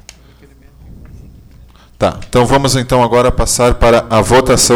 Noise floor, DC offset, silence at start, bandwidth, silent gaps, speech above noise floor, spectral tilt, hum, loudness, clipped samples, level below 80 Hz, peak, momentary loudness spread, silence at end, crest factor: -42 dBFS; under 0.1%; 0.9 s; over 20 kHz; none; 31 dB; -4 dB/octave; none; -11 LUFS; under 0.1%; -24 dBFS; -2 dBFS; 6 LU; 0 s; 12 dB